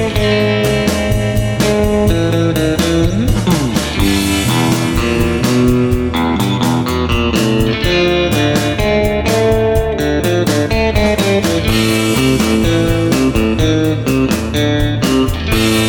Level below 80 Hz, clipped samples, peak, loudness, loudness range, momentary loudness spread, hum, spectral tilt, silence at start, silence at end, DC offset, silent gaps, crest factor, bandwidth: -24 dBFS; under 0.1%; -2 dBFS; -13 LUFS; 1 LU; 2 LU; none; -5.5 dB/octave; 0 s; 0 s; 0.1%; none; 12 dB; 19.5 kHz